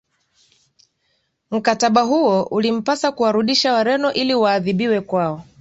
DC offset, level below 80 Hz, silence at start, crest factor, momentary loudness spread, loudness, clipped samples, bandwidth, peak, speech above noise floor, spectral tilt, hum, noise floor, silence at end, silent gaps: under 0.1%; -60 dBFS; 1.5 s; 16 dB; 6 LU; -18 LUFS; under 0.1%; 8 kHz; -2 dBFS; 50 dB; -4.5 dB/octave; none; -68 dBFS; 0.2 s; none